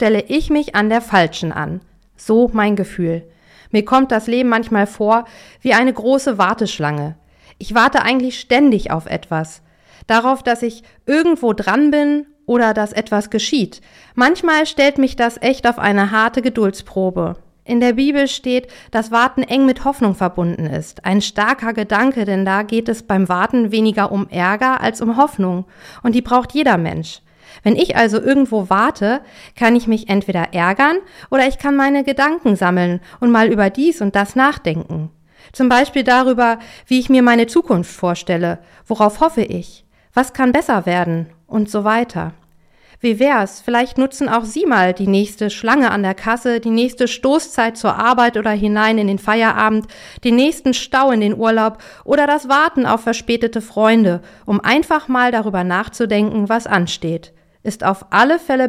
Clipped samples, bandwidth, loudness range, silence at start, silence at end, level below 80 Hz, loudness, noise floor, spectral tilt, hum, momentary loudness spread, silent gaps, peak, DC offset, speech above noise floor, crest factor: under 0.1%; 15 kHz; 2 LU; 0 s; 0 s; -44 dBFS; -16 LUFS; -51 dBFS; -5.5 dB/octave; none; 9 LU; none; 0 dBFS; under 0.1%; 35 dB; 14 dB